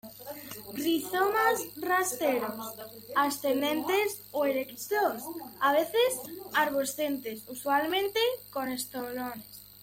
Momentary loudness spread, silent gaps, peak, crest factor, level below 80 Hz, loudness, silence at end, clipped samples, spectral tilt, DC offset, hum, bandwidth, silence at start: 13 LU; none; -12 dBFS; 18 dB; -70 dBFS; -29 LUFS; 0 s; under 0.1%; -2.5 dB/octave; under 0.1%; none; 17 kHz; 0.05 s